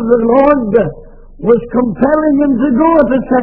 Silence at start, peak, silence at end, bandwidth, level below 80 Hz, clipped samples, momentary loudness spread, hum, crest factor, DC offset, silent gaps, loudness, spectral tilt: 0 s; 0 dBFS; 0 s; 4.4 kHz; -34 dBFS; 0.3%; 5 LU; none; 10 dB; under 0.1%; none; -11 LUFS; -11 dB/octave